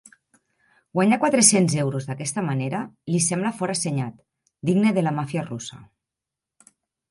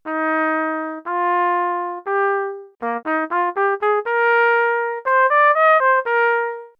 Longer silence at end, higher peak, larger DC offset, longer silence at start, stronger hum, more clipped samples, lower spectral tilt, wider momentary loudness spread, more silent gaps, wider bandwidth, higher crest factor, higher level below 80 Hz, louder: first, 1.25 s vs 0.1 s; about the same, -2 dBFS vs -4 dBFS; neither; first, 0.95 s vs 0.05 s; neither; neither; about the same, -4.5 dB/octave vs -5 dB/octave; first, 14 LU vs 11 LU; neither; first, 11.5 kHz vs 5.4 kHz; first, 22 dB vs 14 dB; first, -66 dBFS vs -78 dBFS; second, -22 LUFS vs -18 LUFS